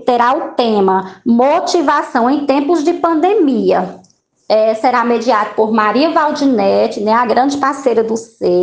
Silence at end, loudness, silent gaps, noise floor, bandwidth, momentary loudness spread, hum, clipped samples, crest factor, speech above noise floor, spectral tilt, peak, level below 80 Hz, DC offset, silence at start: 0 s; -13 LUFS; none; -47 dBFS; 9.6 kHz; 3 LU; none; under 0.1%; 12 dB; 35 dB; -5.5 dB/octave; 0 dBFS; -58 dBFS; under 0.1%; 0 s